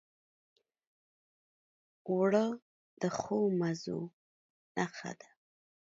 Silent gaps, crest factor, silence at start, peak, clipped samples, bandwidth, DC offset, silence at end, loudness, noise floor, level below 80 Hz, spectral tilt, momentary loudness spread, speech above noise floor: 2.62-2.97 s, 4.13-4.75 s; 20 dB; 2.05 s; -16 dBFS; under 0.1%; 7.8 kHz; under 0.1%; 0.7 s; -34 LUFS; under -90 dBFS; -78 dBFS; -6.5 dB/octave; 17 LU; over 57 dB